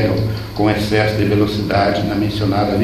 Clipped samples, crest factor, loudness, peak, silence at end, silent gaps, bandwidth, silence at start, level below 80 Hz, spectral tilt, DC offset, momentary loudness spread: under 0.1%; 14 dB; -17 LUFS; -2 dBFS; 0 s; none; 14 kHz; 0 s; -36 dBFS; -7 dB/octave; under 0.1%; 3 LU